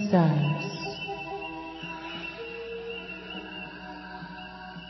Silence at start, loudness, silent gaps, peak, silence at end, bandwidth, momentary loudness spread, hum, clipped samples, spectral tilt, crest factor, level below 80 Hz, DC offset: 0 s; -32 LUFS; none; -10 dBFS; 0 s; 6 kHz; 16 LU; none; under 0.1%; -7 dB/octave; 22 dB; -58 dBFS; under 0.1%